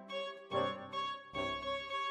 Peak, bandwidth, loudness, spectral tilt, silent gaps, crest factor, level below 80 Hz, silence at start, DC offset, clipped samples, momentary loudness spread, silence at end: -22 dBFS; 11.5 kHz; -39 LUFS; -4.5 dB/octave; none; 18 dB; -66 dBFS; 0 s; under 0.1%; under 0.1%; 4 LU; 0 s